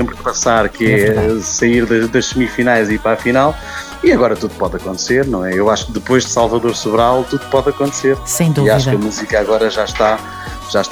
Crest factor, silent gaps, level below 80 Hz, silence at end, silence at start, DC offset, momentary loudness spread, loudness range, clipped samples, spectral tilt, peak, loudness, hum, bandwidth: 14 dB; none; -34 dBFS; 0 s; 0 s; under 0.1%; 6 LU; 1 LU; under 0.1%; -4.5 dB/octave; 0 dBFS; -14 LUFS; none; 19 kHz